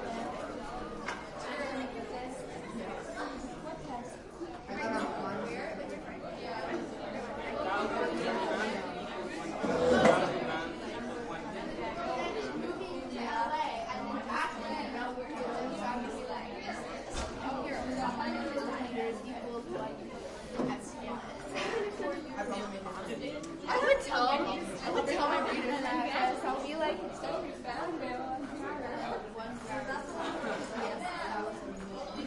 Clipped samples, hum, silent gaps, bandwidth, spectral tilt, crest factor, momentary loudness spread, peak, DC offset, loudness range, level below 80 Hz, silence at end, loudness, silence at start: under 0.1%; none; none; 11.5 kHz; -4.5 dB/octave; 24 dB; 10 LU; -12 dBFS; under 0.1%; 7 LU; -56 dBFS; 0 s; -35 LUFS; 0 s